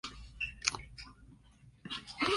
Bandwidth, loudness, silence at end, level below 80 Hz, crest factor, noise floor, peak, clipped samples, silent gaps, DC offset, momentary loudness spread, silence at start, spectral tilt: 11.5 kHz; -38 LUFS; 0 s; -56 dBFS; 32 dB; -61 dBFS; -8 dBFS; under 0.1%; none; under 0.1%; 19 LU; 0.05 s; -2 dB/octave